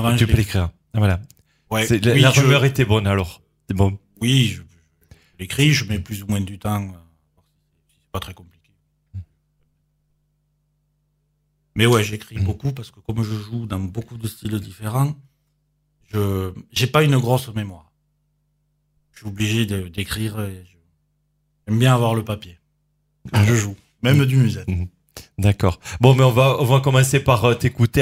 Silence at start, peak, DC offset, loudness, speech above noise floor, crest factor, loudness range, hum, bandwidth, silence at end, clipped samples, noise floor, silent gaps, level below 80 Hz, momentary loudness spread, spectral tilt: 0 s; 0 dBFS; under 0.1%; -19 LUFS; 49 dB; 20 dB; 11 LU; 50 Hz at -45 dBFS; 16 kHz; 0 s; under 0.1%; -68 dBFS; none; -42 dBFS; 16 LU; -5.5 dB/octave